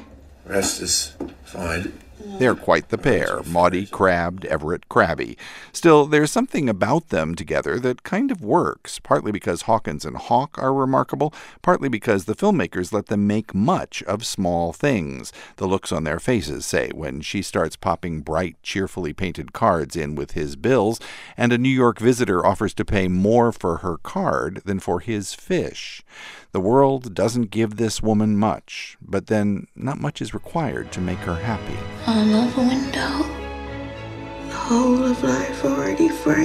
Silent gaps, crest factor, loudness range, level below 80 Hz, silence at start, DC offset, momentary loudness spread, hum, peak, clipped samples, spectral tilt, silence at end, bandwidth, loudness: none; 20 dB; 5 LU; -44 dBFS; 0 s; under 0.1%; 12 LU; none; -2 dBFS; under 0.1%; -5.5 dB/octave; 0 s; 15.5 kHz; -21 LUFS